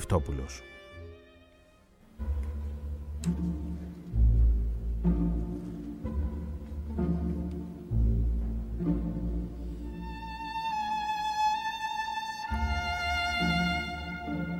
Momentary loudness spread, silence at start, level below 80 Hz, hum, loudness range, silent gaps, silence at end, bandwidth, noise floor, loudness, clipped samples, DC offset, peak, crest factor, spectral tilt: 12 LU; 0 s; -34 dBFS; none; 7 LU; none; 0 s; 11.5 kHz; -59 dBFS; -32 LUFS; under 0.1%; under 0.1%; -12 dBFS; 18 dB; -6 dB/octave